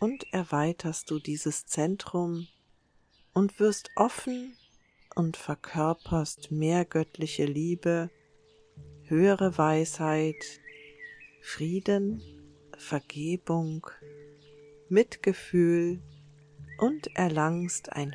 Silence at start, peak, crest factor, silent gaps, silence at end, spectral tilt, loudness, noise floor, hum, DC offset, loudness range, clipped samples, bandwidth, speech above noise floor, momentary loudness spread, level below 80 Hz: 0 s; -8 dBFS; 22 dB; none; 0 s; -6 dB/octave; -29 LUFS; -66 dBFS; none; under 0.1%; 5 LU; under 0.1%; 10.5 kHz; 37 dB; 16 LU; -60 dBFS